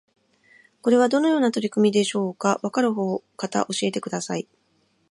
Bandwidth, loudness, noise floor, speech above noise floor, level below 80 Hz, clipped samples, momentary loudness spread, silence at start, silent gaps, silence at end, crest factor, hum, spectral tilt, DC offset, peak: 11.5 kHz; -23 LUFS; -66 dBFS; 44 dB; -74 dBFS; under 0.1%; 9 LU; 0.85 s; none; 0.7 s; 18 dB; none; -5 dB/octave; under 0.1%; -6 dBFS